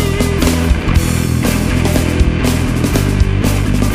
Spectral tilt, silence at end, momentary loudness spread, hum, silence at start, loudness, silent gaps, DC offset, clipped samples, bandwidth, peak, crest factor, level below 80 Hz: -5.5 dB/octave; 0 s; 1 LU; none; 0 s; -14 LUFS; none; under 0.1%; under 0.1%; 15.5 kHz; 0 dBFS; 12 dB; -18 dBFS